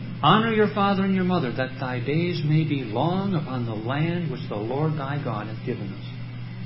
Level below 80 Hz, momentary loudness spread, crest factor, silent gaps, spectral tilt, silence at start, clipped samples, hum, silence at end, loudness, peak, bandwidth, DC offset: -54 dBFS; 11 LU; 20 dB; none; -11.5 dB/octave; 0 s; under 0.1%; none; 0 s; -24 LUFS; -4 dBFS; 5.8 kHz; under 0.1%